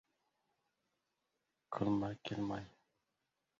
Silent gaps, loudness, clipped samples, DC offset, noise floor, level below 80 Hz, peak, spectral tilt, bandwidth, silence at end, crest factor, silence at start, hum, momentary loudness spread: none; -41 LUFS; under 0.1%; under 0.1%; -87 dBFS; -70 dBFS; -24 dBFS; -6 dB/octave; 7.6 kHz; 0.9 s; 22 dB; 1.7 s; none; 11 LU